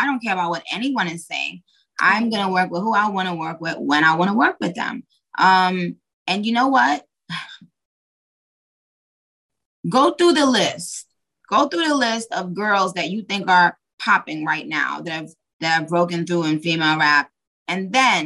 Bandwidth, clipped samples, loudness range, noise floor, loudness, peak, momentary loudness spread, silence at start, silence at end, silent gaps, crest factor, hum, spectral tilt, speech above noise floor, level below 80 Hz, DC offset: 12.5 kHz; under 0.1%; 4 LU; under -90 dBFS; -19 LUFS; -2 dBFS; 14 LU; 0 s; 0 s; 6.13-6.26 s, 7.85-9.49 s, 9.66-9.83 s, 13.93-13.98 s, 15.53-15.60 s, 17.47-17.66 s; 18 dB; none; -4 dB/octave; over 71 dB; -70 dBFS; under 0.1%